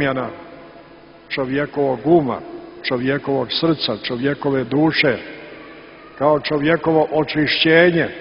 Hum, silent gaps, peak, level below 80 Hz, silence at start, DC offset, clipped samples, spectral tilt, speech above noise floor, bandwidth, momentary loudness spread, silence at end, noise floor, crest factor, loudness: none; none; 0 dBFS; -52 dBFS; 0 s; under 0.1%; under 0.1%; -9 dB/octave; 26 dB; 5.6 kHz; 19 LU; 0 s; -43 dBFS; 18 dB; -18 LUFS